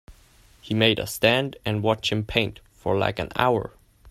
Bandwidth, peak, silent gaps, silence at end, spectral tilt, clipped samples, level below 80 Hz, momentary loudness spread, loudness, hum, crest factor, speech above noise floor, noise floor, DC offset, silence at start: 16 kHz; -4 dBFS; none; 0 s; -5 dB/octave; under 0.1%; -48 dBFS; 8 LU; -24 LUFS; none; 20 dB; 31 dB; -55 dBFS; under 0.1%; 0.1 s